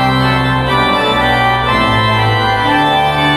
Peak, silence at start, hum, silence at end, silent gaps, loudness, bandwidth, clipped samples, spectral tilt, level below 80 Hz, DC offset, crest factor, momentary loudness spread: 0 dBFS; 0 s; none; 0 s; none; -11 LUFS; 15 kHz; under 0.1%; -5.5 dB/octave; -30 dBFS; under 0.1%; 10 dB; 1 LU